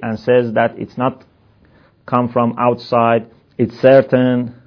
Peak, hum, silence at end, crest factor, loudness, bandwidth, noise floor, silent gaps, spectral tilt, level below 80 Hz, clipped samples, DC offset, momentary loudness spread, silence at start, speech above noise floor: 0 dBFS; none; 0.15 s; 16 dB; -15 LUFS; 5.4 kHz; -51 dBFS; none; -9 dB/octave; -56 dBFS; under 0.1%; under 0.1%; 10 LU; 0 s; 36 dB